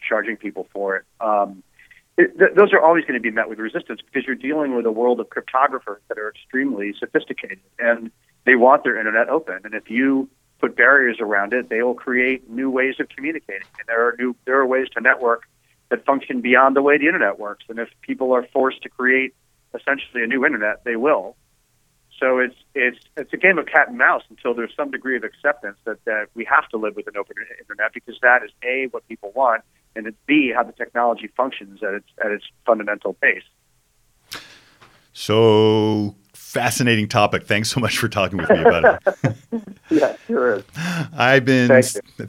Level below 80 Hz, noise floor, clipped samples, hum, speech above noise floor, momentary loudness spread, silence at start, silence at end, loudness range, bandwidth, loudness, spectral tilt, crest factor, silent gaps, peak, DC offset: -58 dBFS; -63 dBFS; under 0.1%; none; 43 dB; 15 LU; 0 s; 0 s; 5 LU; 16.5 kHz; -19 LUFS; -5 dB/octave; 18 dB; none; 0 dBFS; under 0.1%